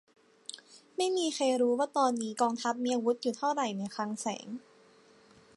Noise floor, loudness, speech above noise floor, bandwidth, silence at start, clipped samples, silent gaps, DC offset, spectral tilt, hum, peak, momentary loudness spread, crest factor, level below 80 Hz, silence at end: -60 dBFS; -31 LUFS; 30 dB; 11.5 kHz; 0.55 s; under 0.1%; none; under 0.1%; -3.5 dB/octave; none; -14 dBFS; 17 LU; 18 dB; -84 dBFS; 1 s